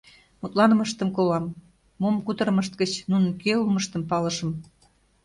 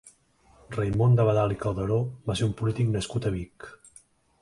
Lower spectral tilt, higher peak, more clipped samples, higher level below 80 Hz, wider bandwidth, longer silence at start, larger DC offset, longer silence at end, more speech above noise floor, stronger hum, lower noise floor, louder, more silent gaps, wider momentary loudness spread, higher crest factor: second, -5.5 dB/octave vs -7 dB/octave; first, -6 dBFS vs -10 dBFS; neither; second, -60 dBFS vs -48 dBFS; about the same, 11.5 kHz vs 11.5 kHz; first, 0.45 s vs 0.05 s; neither; about the same, 0.65 s vs 0.65 s; about the same, 38 dB vs 35 dB; neither; about the same, -62 dBFS vs -60 dBFS; about the same, -24 LUFS vs -26 LUFS; neither; second, 9 LU vs 15 LU; about the same, 18 dB vs 16 dB